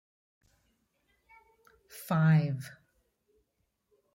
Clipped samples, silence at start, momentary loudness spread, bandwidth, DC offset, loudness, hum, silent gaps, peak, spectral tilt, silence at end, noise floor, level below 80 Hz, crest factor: under 0.1%; 1.95 s; 23 LU; 16.5 kHz; under 0.1%; -28 LUFS; none; none; -16 dBFS; -8 dB/octave; 1.4 s; -79 dBFS; -74 dBFS; 18 dB